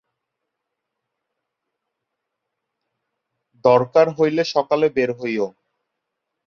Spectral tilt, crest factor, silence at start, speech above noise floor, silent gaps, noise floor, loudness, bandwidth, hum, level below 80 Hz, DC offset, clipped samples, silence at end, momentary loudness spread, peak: -6 dB/octave; 22 dB; 3.65 s; 62 dB; none; -80 dBFS; -19 LUFS; 6.8 kHz; none; -68 dBFS; under 0.1%; under 0.1%; 1 s; 9 LU; -2 dBFS